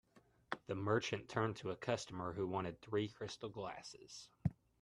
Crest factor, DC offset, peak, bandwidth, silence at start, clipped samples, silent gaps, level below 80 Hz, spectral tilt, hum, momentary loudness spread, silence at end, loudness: 24 dB; under 0.1%; -20 dBFS; 11.5 kHz; 0.15 s; under 0.1%; none; -68 dBFS; -5.5 dB/octave; none; 11 LU; 0.3 s; -43 LUFS